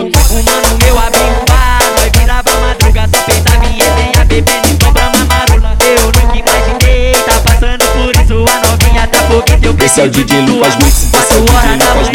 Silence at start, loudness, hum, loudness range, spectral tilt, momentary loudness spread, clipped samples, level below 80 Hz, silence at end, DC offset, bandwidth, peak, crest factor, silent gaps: 0 s; -8 LUFS; none; 1 LU; -4 dB/octave; 2 LU; 0.3%; -10 dBFS; 0 s; under 0.1%; 19 kHz; 0 dBFS; 6 dB; none